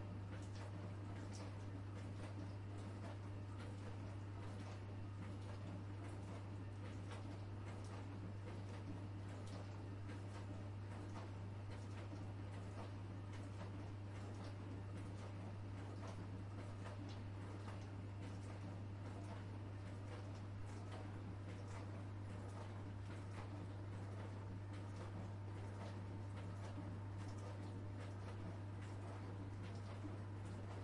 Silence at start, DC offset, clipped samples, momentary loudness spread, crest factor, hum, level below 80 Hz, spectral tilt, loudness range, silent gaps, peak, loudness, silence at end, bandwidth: 0 s; under 0.1%; under 0.1%; 1 LU; 12 dB; none; -66 dBFS; -7 dB/octave; 1 LU; none; -38 dBFS; -51 LUFS; 0 s; 11 kHz